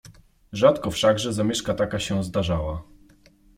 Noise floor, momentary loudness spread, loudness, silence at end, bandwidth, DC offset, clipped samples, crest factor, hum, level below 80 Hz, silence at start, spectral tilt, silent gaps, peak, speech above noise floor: -55 dBFS; 10 LU; -23 LUFS; 0.75 s; 16 kHz; under 0.1%; under 0.1%; 20 dB; none; -44 dBFS; 0.05 s; -5 dB/octave; none; -4 dBFS; 33 dB